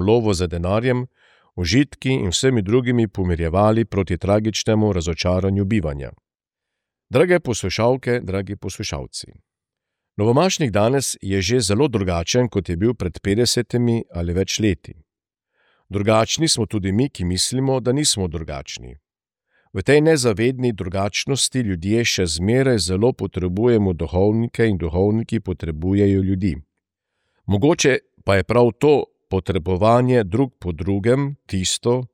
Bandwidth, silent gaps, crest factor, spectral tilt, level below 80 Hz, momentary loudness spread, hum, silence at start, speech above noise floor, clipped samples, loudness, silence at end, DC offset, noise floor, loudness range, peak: 16 kHz; none; 16 dB; -5 dB/octave; -40 dBFS; 9 LU; none; 0 s; 67 dB; under 0.1%; -19 LUFS; 0.1 s; under 0.1%; -86 dBFS; 3 LU; -4 dBFS